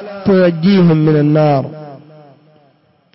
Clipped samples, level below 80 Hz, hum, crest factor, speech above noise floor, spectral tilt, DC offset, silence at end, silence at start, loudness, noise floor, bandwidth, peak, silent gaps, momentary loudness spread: under 0.1%; -50 dBFS; none; 10 dB; 43 dB; -12 dB/octave; under 0.1%; 1.2 s; 0 s; -11 LUFS; -53 dBFS; 5.8 kHz; -2 dBFS; none; 11 LU